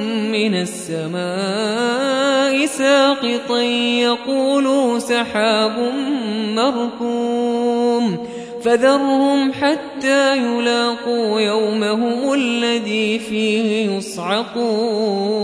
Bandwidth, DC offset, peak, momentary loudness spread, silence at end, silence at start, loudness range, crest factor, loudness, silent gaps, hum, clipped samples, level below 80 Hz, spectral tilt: 11 kHz; under 0.1%; -2 dBFS; 6 LU; 0 s; 0 s; 2 LU; 16 dB; -18 LUFS; none; none; under 0.1%; -62 dBFS; -4 dB/octave